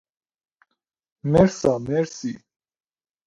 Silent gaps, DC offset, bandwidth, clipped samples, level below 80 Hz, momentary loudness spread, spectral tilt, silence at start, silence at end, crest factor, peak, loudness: none; under 0.1%; 10.5 kHz; under 0.1%; -48 dBFS; 15 LU; -7 dB/octave; 1.25 s; 0.9 s; 22 dB; -2 dBFS; -22 LUFS